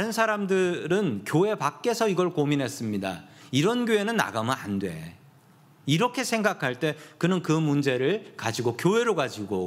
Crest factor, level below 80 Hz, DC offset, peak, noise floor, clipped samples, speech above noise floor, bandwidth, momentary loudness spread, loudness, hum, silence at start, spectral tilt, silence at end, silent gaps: 20 dB; -70 dBFS; under 0.1%; -4 dBFS; -56 dBFS; under 0.1%; 30 dB; 16 kHz; 7 LU; -26 LUFS; none; 0 s; -5.5 dB/octave; 0 s; none